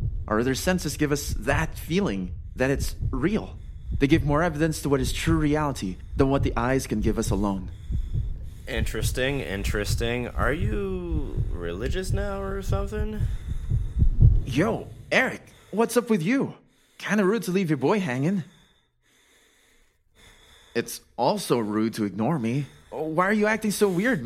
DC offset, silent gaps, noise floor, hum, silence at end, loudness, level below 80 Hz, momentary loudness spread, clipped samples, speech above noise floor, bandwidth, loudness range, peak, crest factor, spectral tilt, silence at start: under 0.1%; none; -64 dBFS; none; 0 s; -26 LUFS; -32 dBFS; 10 LU; under 0.1%; 39 dB; 16.5 kHz; 5 LU; -4 dBFS; 22 dB; -6 dB/octave; 0 s